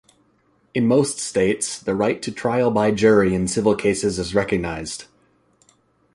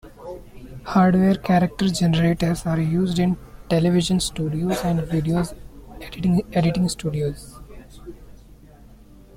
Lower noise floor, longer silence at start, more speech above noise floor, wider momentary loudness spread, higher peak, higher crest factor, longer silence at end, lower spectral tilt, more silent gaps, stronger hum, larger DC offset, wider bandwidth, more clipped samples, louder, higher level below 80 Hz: first, -62 dBFS vs -46 dBFS; first, 0.75 s vs 0.05 s; first, 42 dB vs 26 dB; second, 10 LU vs 20 LU; first, -2 dBFS vs -6 dBFS; about the same, 18 dB vs 16 dB; about the same, 1.1 s vs 1.05 s; second, -5 dB/octave vs -6.5 dB/octave; neither; neither; neither; second, 11.5 kHz vs 15.5 kHz; neither; about the same, -20 LUFS vs -21 LUFS; about the same, -46 dBFS vs -42 dBFS